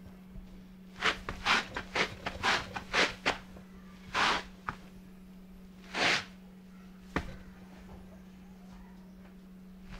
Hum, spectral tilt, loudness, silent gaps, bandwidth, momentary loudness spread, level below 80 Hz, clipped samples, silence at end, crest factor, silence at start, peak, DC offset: none; -2.5 dB/octave; -32 LUFS; none; 16 kHz; 23 LU; -54 dBFS; under 0.1%; 0 s; 26 dB; 0 s; -10 dBFS; under 0.1%